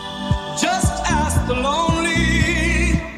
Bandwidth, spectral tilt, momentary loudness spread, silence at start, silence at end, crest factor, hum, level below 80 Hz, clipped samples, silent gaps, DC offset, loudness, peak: 14.5 kHz; -4.5 dB/octave; 4 LU; 0 s; 0 s; 14 dB; none; -26 dBFS; under 0.1%; none; under 0.1%; -19 LUFS; -4 dBFS